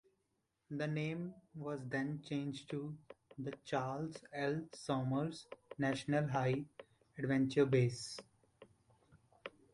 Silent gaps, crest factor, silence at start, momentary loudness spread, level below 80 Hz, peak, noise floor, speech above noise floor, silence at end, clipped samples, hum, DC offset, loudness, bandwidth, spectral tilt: none; 20 dB; 0.7 s; 18 LU; -74 dBFS; -20 dBFS; -84 dBFS; 45 dB; 0.25 s; under 0.1%; none; under 0.1%; -39 LUFS; 11.5 kHz; -6.5 dB/octave